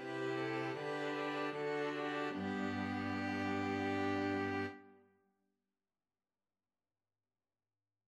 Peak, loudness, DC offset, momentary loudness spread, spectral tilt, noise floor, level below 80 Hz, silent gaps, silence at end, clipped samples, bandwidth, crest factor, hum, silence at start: -26 dBFS; -39 LUFS; under 0.1%; 3 LU; -6 dB/octave; under -90 dBFS; -84 dBFS; none; 3.1 s; under 0.1%; 12 kHz; 16 dB; none; 0 s